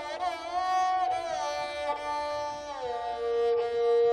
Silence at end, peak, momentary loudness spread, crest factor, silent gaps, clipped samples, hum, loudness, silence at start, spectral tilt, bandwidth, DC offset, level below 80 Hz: 0 s; -18 dBFS; 8 LU; 12 dB; none; under 0.1%; none; -30 LUFS; 0 s; -2.5 dB/octave; 11 kHz; under 0.1%; -62 dBFS